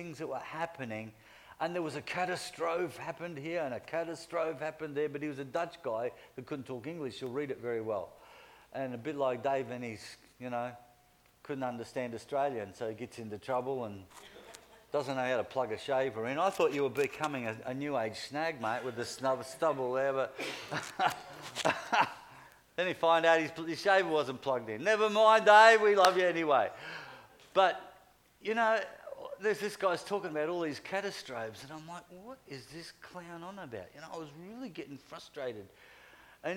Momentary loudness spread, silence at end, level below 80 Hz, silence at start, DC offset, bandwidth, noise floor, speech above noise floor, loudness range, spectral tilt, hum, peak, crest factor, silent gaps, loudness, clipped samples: 18 LU; 0 s; -74 dBFS; 0 s; under 0.1%; 16.5 kHz; -66 dBFS; 33 dB; 14 LU; -4 dB/octave; none; -8 dBFS; 24 dB; none; -32 LUFS; under 0.1%